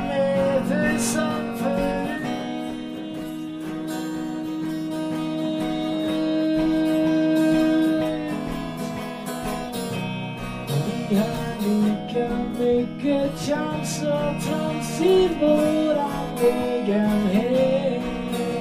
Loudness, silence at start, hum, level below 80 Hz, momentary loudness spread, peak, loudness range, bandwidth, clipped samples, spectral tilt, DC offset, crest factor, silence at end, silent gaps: -24 LUFS; 0 s; none; -46 dBFS; 10 LU; -8 dBFS; 7 LU; 16 kHz; under 0.1%; -6 dB/octave; under 0.1%; 16 dB; 0 s; none